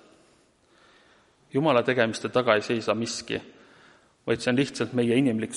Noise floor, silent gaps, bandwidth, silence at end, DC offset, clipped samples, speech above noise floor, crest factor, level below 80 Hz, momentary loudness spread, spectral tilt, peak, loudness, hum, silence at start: -62 dBFS; none; 11.5 kHz; 0 s; under 0.1%; under 0.1%; 37 dB; 22 dB; -64 dBFS; 9 LU; -5 dB/octave; -6 dBFS; -25 LUFS; none; 1.55 s